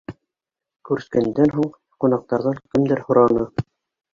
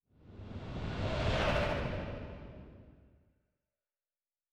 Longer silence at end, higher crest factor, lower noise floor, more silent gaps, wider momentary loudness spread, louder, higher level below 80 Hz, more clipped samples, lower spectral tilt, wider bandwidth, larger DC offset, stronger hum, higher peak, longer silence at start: second, 0.5 s vs 1.5 s; about the same, 18 dB vs 20 dB; about the same, -87 dBFS vs under -90 dBFS; neither; second, 11 LU vs 21 LU; first, -20 LUFS vs -36 LUFS; second, -52 dBFS vs -46 dBFS; neither; first, -9 dB/octave vs -6 dB/octave; second, 7.4 kHz vs 11.5 kHz; neither; neither; first, -2 dBFS vs -20 dBFS; second, 0.1 s vs 0.25 s